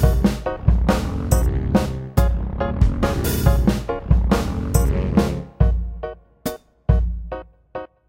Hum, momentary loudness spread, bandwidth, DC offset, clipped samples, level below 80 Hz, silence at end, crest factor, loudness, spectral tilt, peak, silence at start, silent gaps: none; 13 LU; 16.5 kHz; under 0.1%; under 0.1%; -22 dBFS; 0.25 s; 16 dB; -21 LUFS; -7 dB/octave; -2 dBFS; 0 s; none